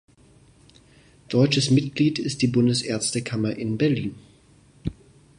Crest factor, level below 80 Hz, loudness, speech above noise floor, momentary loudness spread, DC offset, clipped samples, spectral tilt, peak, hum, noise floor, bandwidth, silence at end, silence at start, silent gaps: 18 dB; -52 dBFS; -23 LUFS; 33 dB; 15 LU; under 0.1%; under 0.1%; -5.5 dB/octave; -6 dBFS; none; -55 dBFS; 11 kHz; 0.45 s; 1.3 s; none